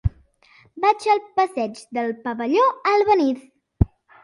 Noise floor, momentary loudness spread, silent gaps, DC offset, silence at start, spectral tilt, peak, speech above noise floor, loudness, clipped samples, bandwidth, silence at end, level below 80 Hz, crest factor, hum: -55 dBFS; 9 LU; none; under 0.1%; 0.05 s; -7 dB/octave; 0 dBFS; 35 dB; -21 LUFS; under 0.1%; 11.5 kHz; 0.35 s; -36 dBFS; 20 dB; none